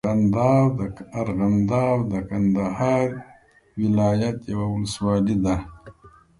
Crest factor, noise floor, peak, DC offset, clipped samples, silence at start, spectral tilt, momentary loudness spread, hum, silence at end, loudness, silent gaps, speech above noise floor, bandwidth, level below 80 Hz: 16 dB; -50 dBFS; -6 dBFS; under 0.1%; under 0.1%; 0.05 s; -8 dB/octave; 10 LU; none; 0.3 s; -22 LUFS; none; 29 dB; 11.5 kHz; -44 dBFS